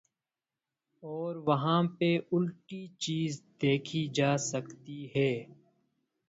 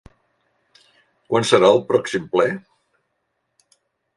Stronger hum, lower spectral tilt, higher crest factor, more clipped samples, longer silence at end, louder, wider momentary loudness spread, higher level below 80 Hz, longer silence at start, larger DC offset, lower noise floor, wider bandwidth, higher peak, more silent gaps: neither; about the same, -5.5 dB/octave vs -4.5 dB/octave; about the same, 20 dB vs 22 dB; neither; second, 0.75 s vs 1.55 s; second, -31 LUFS vs -18 LUFS; first, 15 LU vs 9 LU; second, -72 dBFS vs -60 dBFS; second, 1.05 s vs 1.3 s; neither; first, under -90 dBFS vs -73 dBFS; second, 8 kHz vs 11.5 kHz; second, -12 dBFS vs 0 dBFS; neither